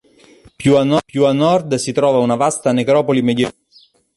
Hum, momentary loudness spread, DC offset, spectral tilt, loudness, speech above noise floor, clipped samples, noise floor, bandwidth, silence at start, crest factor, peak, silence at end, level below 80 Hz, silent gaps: none; 5 LU; under 0.1%; -5.5 dB/octave; -15 LUFS; 37 dB; under 0.1%; -51 dBFS; 11.5 kHz; 0.6 s; 14 dB; -2 dBFS; 0.65 s; -52 dBFS; none